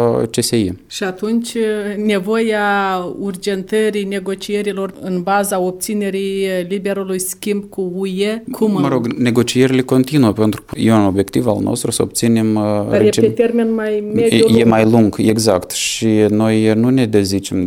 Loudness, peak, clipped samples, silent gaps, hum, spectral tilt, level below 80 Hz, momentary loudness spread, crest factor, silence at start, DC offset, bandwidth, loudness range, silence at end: -16 LUFS; 0 dBFS; under 0.1%; none; none; -5.5 dB/octave; -48 dBFS; 8 LU; 14 dB; 0 s; under 0.1%; 18 kHz; 6 LU; 0 s